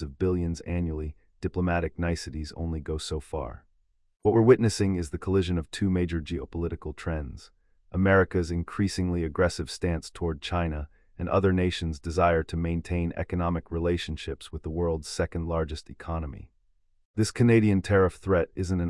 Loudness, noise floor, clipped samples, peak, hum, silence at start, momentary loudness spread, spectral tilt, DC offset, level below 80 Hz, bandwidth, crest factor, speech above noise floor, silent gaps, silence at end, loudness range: -28 LUFS; -67 dBFS; under 0.1%; -6 dBFS; none; 0 s; 14 LU; -6.5 dB/octave; under 0.1%; -44 dBFS; 12 kHz; 20 dB; 40 dB; 17.05-17.14 s; 0 s; 5 LU